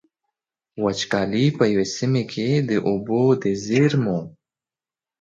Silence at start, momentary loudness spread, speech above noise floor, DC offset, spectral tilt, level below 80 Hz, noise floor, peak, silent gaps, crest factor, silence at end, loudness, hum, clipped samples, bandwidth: 0.75 s; 7 LU; over 70 dB; under 0.1%; -6 dB/octave; -58 dBFS; under -90 dBFS; -4 dBFS; none; 18 dB; 0.9 s; -21 LUFS; none; under 0.1%; 7.8 kHz